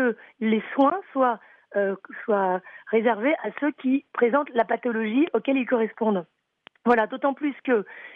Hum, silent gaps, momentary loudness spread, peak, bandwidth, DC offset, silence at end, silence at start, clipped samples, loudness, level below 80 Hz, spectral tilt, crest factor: none; none; 7 LU; -8 dBFS; 4.4 kHz; under 0.1%; 0 s; 0 s; under 0.1%; -24 LUFS; -74 dBFS; -8.5 dB/octave; 16 dB